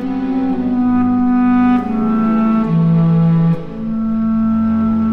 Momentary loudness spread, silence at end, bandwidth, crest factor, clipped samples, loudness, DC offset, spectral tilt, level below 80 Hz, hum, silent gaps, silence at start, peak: 6 LU; 0 s; 4.5 kHz; 10 dB; under 0.1%; -15 LUFS; under 0.1%; -10.5 dB/octave; -40 dBFS; none; none; 0 s; -4 dBFS